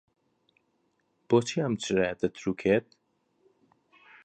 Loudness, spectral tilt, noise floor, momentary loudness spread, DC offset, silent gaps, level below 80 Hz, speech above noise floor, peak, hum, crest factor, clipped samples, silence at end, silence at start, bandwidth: -28 LUFS; -5.5 dB/octave; -73 dBFS; 5 LU; under 0.1%; none; -62 dBFS; 46 dB; -10 dBFS; none; 20 dB; under 0.1%; 1.45 s; 1.3 s; 9.4 kHz